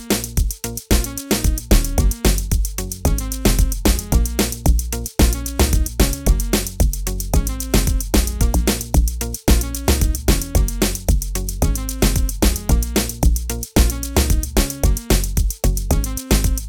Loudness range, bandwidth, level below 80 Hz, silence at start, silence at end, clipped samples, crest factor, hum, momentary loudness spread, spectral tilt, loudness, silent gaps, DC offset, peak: 1 LU; over 20 kHz; -20 dBFS; 0 s; 0 s; under 0.1%; 14 dB; none; 4 LU; -4.5 dB/octave; -19 LUFS; none; 0.2%; -4 dBFS